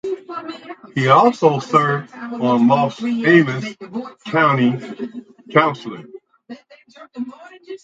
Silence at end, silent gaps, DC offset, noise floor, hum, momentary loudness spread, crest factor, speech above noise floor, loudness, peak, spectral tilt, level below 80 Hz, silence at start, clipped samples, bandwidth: 0.05 s; none; under 0.1%; -40 dBFS; none; 19 LU; 18 dB; 23 dB; -17 LUFS; 0 dBFS; -7 dB/octave; -66 dBFS; 0.05 s; under 0.1%; 7.8 kHz